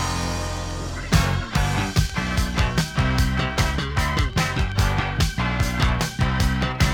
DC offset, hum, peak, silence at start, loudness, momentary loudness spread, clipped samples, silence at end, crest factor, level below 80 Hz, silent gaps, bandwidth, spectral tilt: under 0.1%; none; -2 dBFS; 0 s; -23 LUFS; 4 LU; under 0.1%; 0 s; 18 dB; -26 dBFS; none; 19 kHz; -4.5 dB/octave